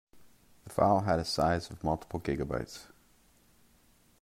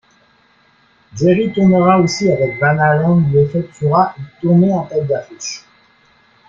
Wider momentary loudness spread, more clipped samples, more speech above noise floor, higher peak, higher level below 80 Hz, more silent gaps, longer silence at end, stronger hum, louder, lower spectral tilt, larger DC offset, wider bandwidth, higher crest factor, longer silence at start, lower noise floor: about the same, 12 LU vs 12 LU; neither; second, 34 dB vs 40 dB; second, -12 dBFS vs 0 dBFS; about the same, -54 dBFS vs -50 dBFS; neither; first, 1.35 s vs 0.9 s; neither; second, -31 LUFS vs -14 LUFS; about the same, -6 dB/octave vs -7 dB/octave; neither; first, 16 kHz vs 7.6 kHz; first, 22 dB vs 14 dB; second, 0.15 s vs 1.15 s; first, -65 dBFS vs -53 dBFS